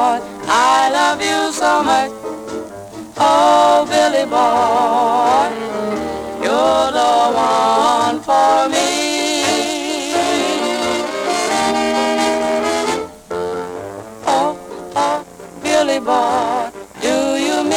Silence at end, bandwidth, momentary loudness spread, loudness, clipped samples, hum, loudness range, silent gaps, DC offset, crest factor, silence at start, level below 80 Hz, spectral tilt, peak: 0 s; 18 kHz; 12 LU; -15 LUFS; under 0.1%; none; 5 LU; none; under 0.1%; 14 dB; 0 s; -52 dBFS; -2.5 dB/octave; -2 dBFS